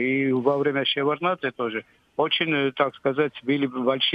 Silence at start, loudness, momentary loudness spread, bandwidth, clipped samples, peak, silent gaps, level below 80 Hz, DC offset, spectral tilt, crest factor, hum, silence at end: 0 s; -24 LUFS; 6 LU; 5.2 kHz; under 0.1%; -8 dBFS; none; -72 dBFS; under 0.1%; -7.5 dB/octave; 16 dB; none; 0 s